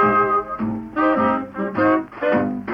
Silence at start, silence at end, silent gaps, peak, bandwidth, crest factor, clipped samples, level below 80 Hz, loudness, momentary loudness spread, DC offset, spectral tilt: 0 s; 0 s; none; -6 dBFS; 5.6 kHz; 14 dB; under 0.1%; -52 dBFS; -20 LUFS; 8 LU; under 0.1%; -8.5 dB/octave